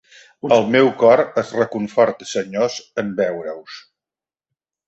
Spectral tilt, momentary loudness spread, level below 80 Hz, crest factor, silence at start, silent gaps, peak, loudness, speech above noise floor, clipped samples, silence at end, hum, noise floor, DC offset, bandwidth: -5 dB/octave; 17 LU; -62 dBFS; 18 dB; 0.45 s; none; -2 dBFS; -18 LUFS; over 72 dB; under 0.1%; 1.1 s; none; under -90 dBFS; under 0.1%; 8.2 kHz